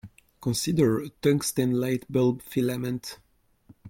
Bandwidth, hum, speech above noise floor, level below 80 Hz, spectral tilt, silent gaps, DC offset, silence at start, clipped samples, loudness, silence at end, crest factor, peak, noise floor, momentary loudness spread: 17 kHz; none; 32 dB; -58 dBFS; -5.5 dB/octave; none; under 0.1%; 0.05 s; under 0.1%; -26 LUFS; 0 s; 16 dB; -10 dBFS; -57 dBFS; 9 LU